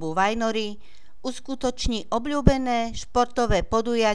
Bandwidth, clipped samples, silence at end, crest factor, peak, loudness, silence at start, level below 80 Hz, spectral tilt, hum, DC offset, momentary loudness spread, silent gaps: 11 kHz; under 0.1%; 0 s; 24 dB; 0 dBFS; -25 LUFS; 0 s; -34 dBFS; -5 dB/octave; none; 2%; 11 LU; none